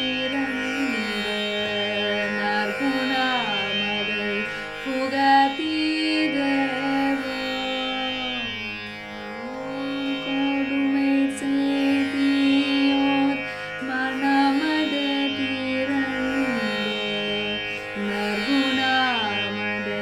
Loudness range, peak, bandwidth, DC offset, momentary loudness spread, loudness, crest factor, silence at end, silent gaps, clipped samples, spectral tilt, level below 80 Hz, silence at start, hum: 4 LU; -8 dBFS; 13.5 kHz; under 0.1%; 8 LU; -23 LUFS; 16 dB; 0 s; none; under 0.1%; -4 dB/octave; -56 dBFS; 0 s; none